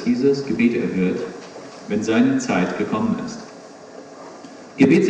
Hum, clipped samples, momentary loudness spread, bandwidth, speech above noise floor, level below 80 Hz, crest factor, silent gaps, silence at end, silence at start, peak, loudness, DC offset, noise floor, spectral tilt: none; under 0.1%; 21 LU; 9.2 kHz; 21 dB; -58 dBFS; 18 dB; none; 0 s; 0 s; -2 dBFS; -20 LUFS; under 0.1%; -40 dBFS; -6.5 dB/octave